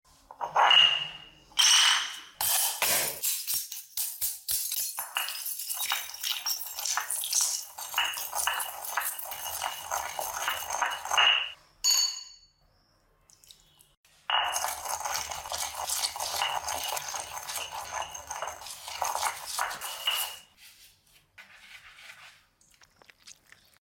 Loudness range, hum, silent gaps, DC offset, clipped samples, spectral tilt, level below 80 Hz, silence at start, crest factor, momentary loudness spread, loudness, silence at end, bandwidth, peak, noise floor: 9 LU; none; 13.97-14.04 s; under 0.1%; under 0.1%; 2.5 dB/octave; -66 dBFS; 0.3 s; 22 dB; 15 LU; -27 LUFS; 0.5 s; 17 kHz; -8 dBFS; -67 dBFS